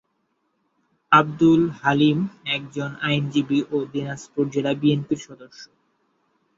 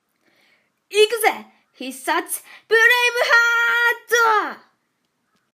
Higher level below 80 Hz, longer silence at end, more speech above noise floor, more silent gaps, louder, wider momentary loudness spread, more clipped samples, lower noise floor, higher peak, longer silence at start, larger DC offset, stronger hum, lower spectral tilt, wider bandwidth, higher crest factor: first, -60 dBFS vs -80 dBFS; about the same, 0.9 s vs 1 s; about the same, 50 dB vs 53 dB; neither; second, -21 LUFS vs -17 LUFS; second, 12 LU vs 16 LU; neither; about the same, -71 dBFS vs -71 dBFS; about the same, -2 dBFS vs -2 dBFS; first, 1.1 s vs 0.9 s; neither; neither; first, -6.5 dB/octave vs 0.5 dB/octave; second, 7.8 kHz vs 15.5 kHz; about the same, 20 dB vs 18 dB